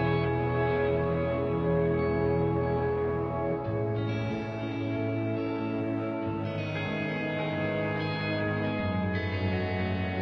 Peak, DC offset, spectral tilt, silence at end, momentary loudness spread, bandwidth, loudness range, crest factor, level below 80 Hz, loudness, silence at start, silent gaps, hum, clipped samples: -16 dBFS; under 0.1%; -9 dB/octave; 0 s; 5 LU; 6.2 kHz; 3 LU; 14 dB; -48 dBFS; -30 LUFS; 0 s; none; none; under 0.1%